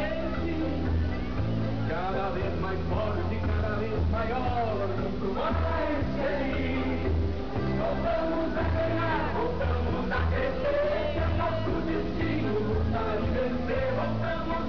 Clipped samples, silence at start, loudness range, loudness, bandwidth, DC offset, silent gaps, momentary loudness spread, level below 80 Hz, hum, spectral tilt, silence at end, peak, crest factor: under 0.1%; 0 s; 2 LU; -29 LUFS; 5.4 kHz; 2%; none; 3 LU; -36 dBFS; none; -8.5 dB/octave; 0 s; -18 dBFS; 10 dB